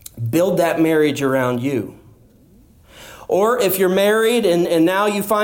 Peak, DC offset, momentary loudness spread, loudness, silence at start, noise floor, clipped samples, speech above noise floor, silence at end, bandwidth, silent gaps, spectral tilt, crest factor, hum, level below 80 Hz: -6 dBFS; under 0.1%; 7 LU; -17 LUFS; 0.15 s; -49 dBFS; under 0.1%; 33 dB; 0 s; 17 kHz; none; -5 dB/octave; 12 dB; none; -54 dBFS